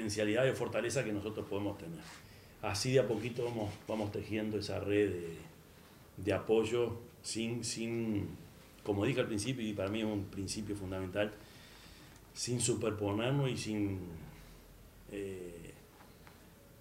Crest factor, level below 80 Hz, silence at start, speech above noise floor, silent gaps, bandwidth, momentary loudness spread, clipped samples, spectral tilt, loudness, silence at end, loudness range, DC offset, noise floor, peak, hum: 20 dB; -64 dBFS; 0 s; 23 dB; none; 16 kHz; 22 LU; under 0.1%; -5 dB/octave; -36 LUFS; 0 s; 3 LU; under 0.1%; -58 dBFS; -16 dBFS; none